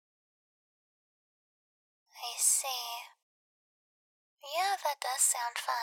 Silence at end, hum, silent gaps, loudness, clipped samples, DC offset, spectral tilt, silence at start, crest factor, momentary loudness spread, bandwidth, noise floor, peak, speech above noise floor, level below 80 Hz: 0 s; none; 3.22-4.37 s; -30 LUFS; under 0.1%; under 0.1%; 7 dB/octave; 2.15 s; 24 dB; 15 LU; 19 kHz; under -90 dBFS; -12 dBFS; over 58 dB; under -90 dBFS